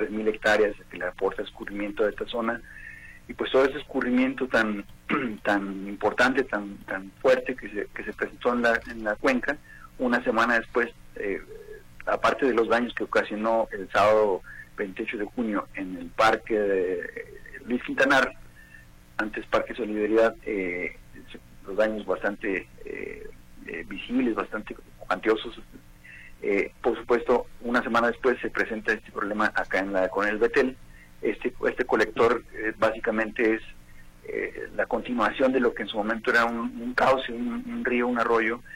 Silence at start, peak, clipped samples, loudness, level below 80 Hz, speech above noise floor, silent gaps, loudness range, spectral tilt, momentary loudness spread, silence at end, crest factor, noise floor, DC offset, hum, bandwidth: 0 s; -10 dBFS; under 0.1%; -26 LUFS; -50 dBFS; 24 dB; none; 4 LU; -5 dB/octave; 13 LU; 0 s; 18 dB; -50 dBFS; under 0.1%; none; 16.5 kHz